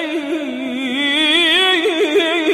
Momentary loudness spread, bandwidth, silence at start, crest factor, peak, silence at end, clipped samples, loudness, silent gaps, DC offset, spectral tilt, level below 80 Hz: 11 LU; 15.5 kHz; 0 s; 14 dB; -2 dBFS; 0 s; under 0.1%; -15 LUFS; none; under 0.1%; -1.5 dB/octave; -62 dBFS